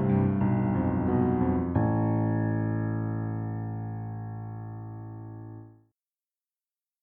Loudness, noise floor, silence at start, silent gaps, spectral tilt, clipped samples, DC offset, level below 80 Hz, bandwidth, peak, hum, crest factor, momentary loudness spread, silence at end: -28 LUFS; under -90 dBFS; 0 s; none; -13.5 dB/octave; under 0.1%; under 0.1%; -50 dBFS; 3.2 kHz; -12 dBFS; none; 16 dB; 16 LU; 1.3 s